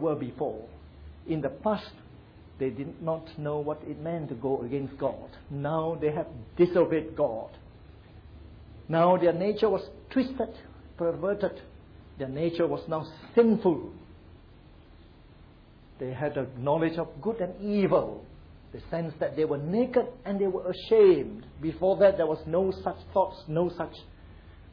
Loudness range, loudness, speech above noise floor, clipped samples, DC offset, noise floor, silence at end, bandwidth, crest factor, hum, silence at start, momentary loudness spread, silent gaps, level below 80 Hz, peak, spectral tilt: 8 LU; -28 LUFS; 26 dB; under 0.1%; under 0.1%; -53 dBFS; 0 s; 5.4 kHz; 18 dB; none; 0 s; 15 LU; none; -54 dBFS; -10 dBFS; -10 dB/octave